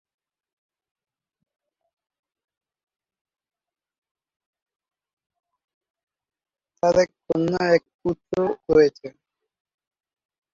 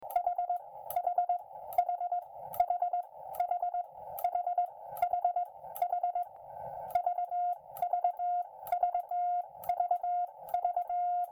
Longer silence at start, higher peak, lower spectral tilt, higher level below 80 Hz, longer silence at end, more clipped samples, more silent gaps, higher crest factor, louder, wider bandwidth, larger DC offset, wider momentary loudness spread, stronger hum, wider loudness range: first, 6.85 s vs 0 s; first, -6 dBFS vs -16 dBFS; first, -6 dB/octave vs -3.5 dB/octave; first, -58 dBFS vs -72 dBFS; first, 1.45 s vs 0 s; neither; first, 7.94-7.99 s vs none; about the same, 22 dB vs 18 dB; first, -22 LUFS vs -34 LUFS; second, 7.4 kHz vs 19.5 kHz; neither; first, 11 LU vs 7 LU; neither; first, 6 LU vs 1 LU